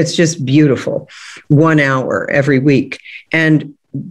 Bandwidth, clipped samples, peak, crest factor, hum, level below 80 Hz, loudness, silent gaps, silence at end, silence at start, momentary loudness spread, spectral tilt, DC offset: 11 kHz; under 0.1%; 0 dBFS; 12 dB; none; -54 dBFS; -13 LUFS; none; 0 s; 0 s; 17 LU; -6 dB/octave; under 0.1%